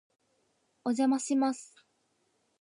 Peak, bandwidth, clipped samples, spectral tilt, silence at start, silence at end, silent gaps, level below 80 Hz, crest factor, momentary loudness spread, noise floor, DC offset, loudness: -18 dBFS; 11 kHz; under 0.1%; -3.5 dB/octave; 0.85 s; 0.95 s; none; -88 dBFS; 16 dB; 11 LU; -75 dBFS; under 0.1%; -30 LUFS